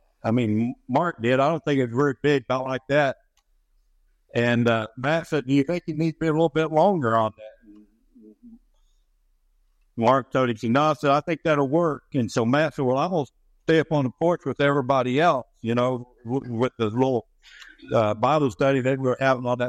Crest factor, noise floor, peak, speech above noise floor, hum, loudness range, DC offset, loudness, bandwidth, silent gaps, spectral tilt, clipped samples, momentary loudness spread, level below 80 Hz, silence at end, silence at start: 18 dB; -65 dBFS; -6 dBFS; 43 dB; none; 3 LU; under 0.1%; -23 LUFS; 11.5 kHz; none; -7 dB/octave; under 0.1%; 6 LU; -60 dBFS; 0 s; 0.25 s